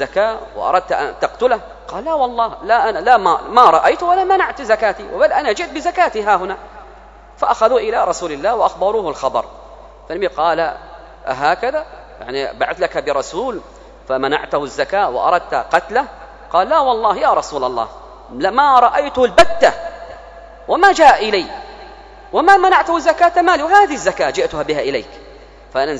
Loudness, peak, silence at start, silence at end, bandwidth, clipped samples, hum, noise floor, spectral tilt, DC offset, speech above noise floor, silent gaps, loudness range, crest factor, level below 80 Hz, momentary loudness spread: -15 LUFS; 0 dBFS; 0 s; 0 s; 11 kHz; 0.2%; none; -40 dBFS; -3.5 dB/octave; under 0.1%; 25 dB; none; 7 LU; 16 dB; -44 dBFS; 15 LU